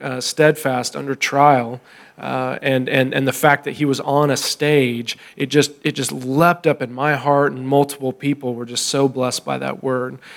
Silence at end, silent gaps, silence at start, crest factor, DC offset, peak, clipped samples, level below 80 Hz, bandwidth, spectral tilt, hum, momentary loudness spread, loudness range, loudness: 0 s; none; 0 s; 18 dB; under 0.1%; 0 dBFS; under 0.1%; -66 dBFS; 18.5 kHz; -4.5 dB/octave; none; 9 LU; 1 LU; -18 LUFS